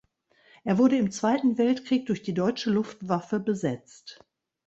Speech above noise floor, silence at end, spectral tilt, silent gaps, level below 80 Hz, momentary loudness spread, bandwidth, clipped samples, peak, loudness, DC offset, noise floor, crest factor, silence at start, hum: 37 dB; 0.55 s; -6 dB/octave; none; -66 dBFS; 15 LU; 8 kHz; under 0.1%; -10 dBFS; -26 LUFS; under 0.1%; -63 dBFS; 18 dB; 0.65 s; none